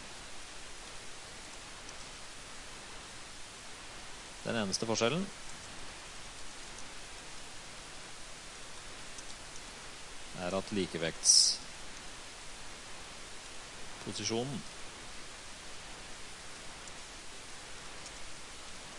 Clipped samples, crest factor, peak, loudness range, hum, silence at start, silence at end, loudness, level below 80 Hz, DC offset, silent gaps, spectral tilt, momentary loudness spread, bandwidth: under 0.1%; 28 dB; -10 dBFS; 15 LU; none; 0 s; 0 s; -37 LUFS; -58 dBFS; under 0.1%; none; -2 dB/octave; 14 LU; 11.5 kHz